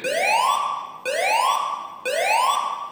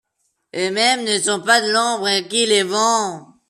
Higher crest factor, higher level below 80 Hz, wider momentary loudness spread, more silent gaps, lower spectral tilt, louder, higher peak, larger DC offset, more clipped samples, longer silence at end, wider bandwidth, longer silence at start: about the same, 14 dB vs 16 dB; second, -82 dBFS vs -70 dBFS; about the same, 9 LU vs 8 LU; neither; second, 0.5 dB/octave vs -1.5 dB/octave; second, -21 LUFS vs -17 LUFS; second, -8 dBFS vs -2 dBFS; neither; neither; second, 0 s vs 0.25 s; first, 19.5 kHz vs 14 kHz; second, 0 s vs 0.55 s